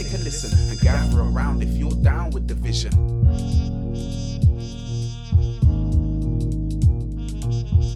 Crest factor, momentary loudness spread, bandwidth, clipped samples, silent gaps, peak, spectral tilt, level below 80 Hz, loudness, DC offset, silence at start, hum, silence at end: 14 dB; 9 LU; 11.5 kHz; under 0.1%; none; -6 dBFS; -6.5 dB/octave; -24 dBFS; -22 LUFS; under 0.1%; 0 s; none; 0 s